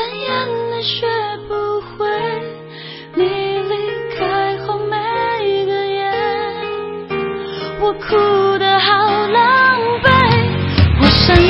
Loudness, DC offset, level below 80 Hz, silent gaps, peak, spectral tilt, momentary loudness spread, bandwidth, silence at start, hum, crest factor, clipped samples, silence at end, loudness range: -16 LUFS; under 0.1%; -30 dBFS; none; 0 dBFS; -7.5 dB/octave; 12 LU; 6.8 kHz; 0 s; none; 16 dB; under 0.1%; 0 s; 8 LU